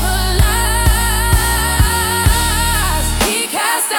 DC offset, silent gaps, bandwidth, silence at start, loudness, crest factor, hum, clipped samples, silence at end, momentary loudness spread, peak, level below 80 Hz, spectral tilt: under 0.1%; none; 18 kHz; 0 s; -14 LUFS; 14 dB; none; under 0.1%; 0 s; 2 LU; 0 dBFS; -18 dBFS; -3 dB/octave